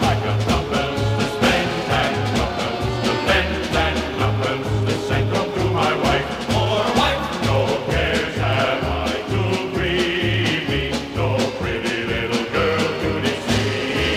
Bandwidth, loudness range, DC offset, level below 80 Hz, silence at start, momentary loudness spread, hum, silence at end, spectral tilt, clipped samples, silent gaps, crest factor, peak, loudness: 15.5 kHz; 1 LU; under 0.1%; -34 dBFS; 0 s; 4 LU; none; 0 s; -5 dB/octave; under 0.1%; none; 16 dB; -4 dBFS; -20 LUFS